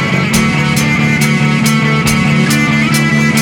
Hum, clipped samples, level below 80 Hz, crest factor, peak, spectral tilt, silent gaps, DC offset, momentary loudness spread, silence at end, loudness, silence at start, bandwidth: none; under 0.1%; -36 dBFS; 10 dB; 0 dBFS; -4.5 dB/octave; none; under 0.1%; 1 LU; 0 s; -11 LUFS; 0 s; 18 kHz